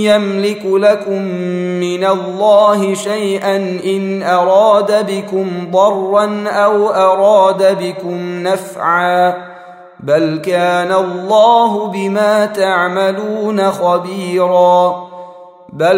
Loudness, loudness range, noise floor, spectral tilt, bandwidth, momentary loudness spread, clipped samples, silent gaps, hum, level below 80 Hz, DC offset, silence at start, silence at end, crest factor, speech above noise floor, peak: -13 LUFS; 2 LU; -35 dBFS; -5.5 dB/octave; 16 kHz; 9 LU; under 0.1%; none; none; -64 dBFS; under 0.1%; 0 s; 0 s; 12 dB; 23 dB; 0 dBFS